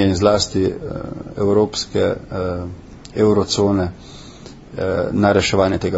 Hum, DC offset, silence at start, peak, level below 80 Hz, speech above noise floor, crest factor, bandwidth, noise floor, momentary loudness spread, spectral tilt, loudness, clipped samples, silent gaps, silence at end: none; under 0.1%; 0 s; 0 dBFS; -40 dBFS; 21 dB; 18 dB; 8 kHz; -38 dBFS; 20 LU; -5.5 dB/octave; -18 LUFS; under 0.1%; none; 0 s